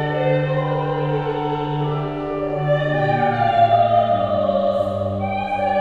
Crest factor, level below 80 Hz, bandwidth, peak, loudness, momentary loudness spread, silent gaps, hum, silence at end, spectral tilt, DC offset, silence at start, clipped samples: 14 dB; -46 dBFS; 5.2 kHz; -4 dBFS; -20 LUFS; 8 LU; none; none; 0 s; -8.5 dB/octave; 0.1%; 0 s; under 0.1%